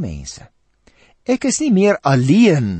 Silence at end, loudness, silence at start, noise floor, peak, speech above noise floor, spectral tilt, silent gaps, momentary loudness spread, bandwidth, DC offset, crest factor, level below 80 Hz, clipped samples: 0 s; -15 LUFS; 0 s; -54 dBFS; -2 dBFS; 39 dB; -6 dB/octave; none; 19 LU; 8.8 kHz; under 0.1%; 14 dB; -44 dBFS; under 0.1%